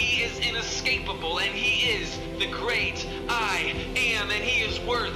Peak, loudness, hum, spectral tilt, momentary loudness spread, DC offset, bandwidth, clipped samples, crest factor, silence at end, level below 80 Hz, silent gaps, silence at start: -14 dBFS; -25 LUFS; none; -2.5 dB/octave; 6 LU; under 0.1%; 16 kHz; under 0.1%; 14 dB; 0 s; -42 dBFS; none; 0 s